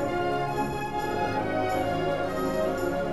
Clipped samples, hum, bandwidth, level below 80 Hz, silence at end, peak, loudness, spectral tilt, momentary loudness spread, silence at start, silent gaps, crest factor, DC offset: under 0.1%; none; 15 kHz; -46 dBFS; 0 s; -16 dBFS; -28 LUFS; -6 dB/octave; 2 LU; 0 s; none; 12 dB; under 0.1%